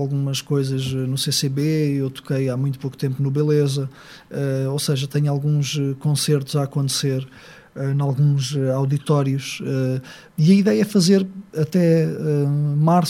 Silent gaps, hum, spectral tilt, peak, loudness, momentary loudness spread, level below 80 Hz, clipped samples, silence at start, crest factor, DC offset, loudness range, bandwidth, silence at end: none; none; -6 dB/octave; -4 dBFS; -20 LUFS; 9 LU; -60 dBFS; under 0.1%; 0 s; 16 dB; under 0.1%; 3 LU; 15.5 kHz; 0 s